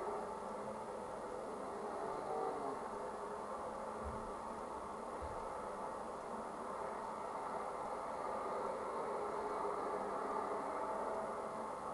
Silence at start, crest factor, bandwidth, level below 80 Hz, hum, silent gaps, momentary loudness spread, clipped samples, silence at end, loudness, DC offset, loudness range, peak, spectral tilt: 0 s; 18 dB; 12 kHz; -64 dBFS; 50 Hz at -70 dBFS; none; 5 LU; under 0.1%; 0 s; -44 LUFS; under 0.1%; 4 LU; -26 dBFS; -5 dB/octave